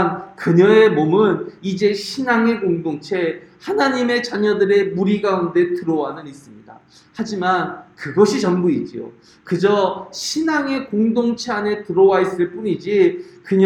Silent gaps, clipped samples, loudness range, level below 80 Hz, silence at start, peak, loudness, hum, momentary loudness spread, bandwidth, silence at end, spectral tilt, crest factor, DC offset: none; under 0.1%; 4 LU; -60 dBFS; 0 s; -2 dBFS; -18 LUFS; none; 12 LU; 11.5 kHz; 0 s; -6 dB/octave; 16 dB; under 0.1%